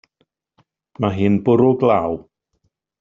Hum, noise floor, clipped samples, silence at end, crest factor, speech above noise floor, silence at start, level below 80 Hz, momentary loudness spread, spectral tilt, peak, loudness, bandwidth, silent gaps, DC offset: none; -69 dBFS; under 0.1%; 0.8 s; 18 dB; 54 dB; 1 s; -54 dBFS; 10 LU; -7.5 dB/octave; -2 dBFS; -17 LUFS; 7 kHz; none; under 0.1%